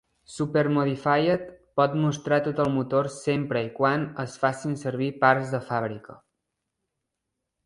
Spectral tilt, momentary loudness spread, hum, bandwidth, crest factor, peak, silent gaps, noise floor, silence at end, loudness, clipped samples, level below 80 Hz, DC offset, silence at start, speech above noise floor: -6.5 dB/octave; 8 LU; none; 11.5 kHz; 22 dB; -4 dBFS; none; -83 dBFS; 1.5 s; -25 LUFS; under 0.1%; -62 dBFS; under 0.1%; 0.3 s; 58 dB